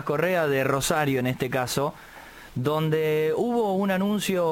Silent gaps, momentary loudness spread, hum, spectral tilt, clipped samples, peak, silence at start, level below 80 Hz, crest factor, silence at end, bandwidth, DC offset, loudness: none; 8 LU; none; -5 dB/octave; under 0.1%; -10 dBFS; 0 s; -54 dBFS; 14 dB; 0 s; 17 kHz; under 0.1%; -25 LUFS